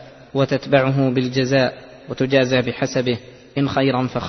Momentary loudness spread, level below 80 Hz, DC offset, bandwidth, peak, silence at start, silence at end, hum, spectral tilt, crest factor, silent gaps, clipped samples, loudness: 11 LU; -52 dBFS; under 0.1%; 6.4 kHz; -2 dBFS; 0 s; 0 s; none; -6 dB/octave; 18 dB; none; under 0.1%; -19 LUFS